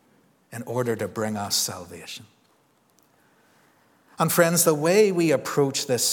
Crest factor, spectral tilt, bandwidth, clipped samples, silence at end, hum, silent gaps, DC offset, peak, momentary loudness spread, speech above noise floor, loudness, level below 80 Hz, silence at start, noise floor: 22 dB; -3.5 dB/octave; 19.5 kHz; under 0.1%; 0 s; none; none; under 0.1%; -4 dBFS; 19 LU; 40 dB; -22 LUFS; -72 dBFS; 0.5 s; -63 dBFS